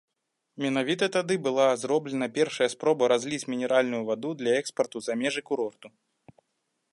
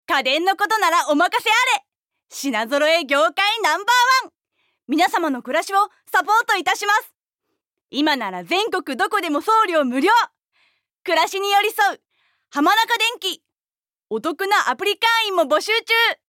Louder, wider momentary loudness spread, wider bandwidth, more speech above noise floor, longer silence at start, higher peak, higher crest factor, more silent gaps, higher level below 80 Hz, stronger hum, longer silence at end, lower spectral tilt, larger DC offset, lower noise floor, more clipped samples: second, -27 LUFS vs -18 LUFS; about the same, 7 LU vs 8 LU; second, 11.5 kHz vs 17 kHz; second, 54 dB vs over 71 dB; first, 0.55 s vs 0.1 s; about the same, -10 dBFS vs -8 dBFS; first, 18 dB vs 12 dB; second, none vs 13.61-13.65 s; second, -78 dBFS vs -72 dBFS; neither; first, 1.05 s vs 0.15 s; first, -4 dB/octave vs -1 dB/octave; neither; second, -80 dBFS vs under -90 dBFS; neither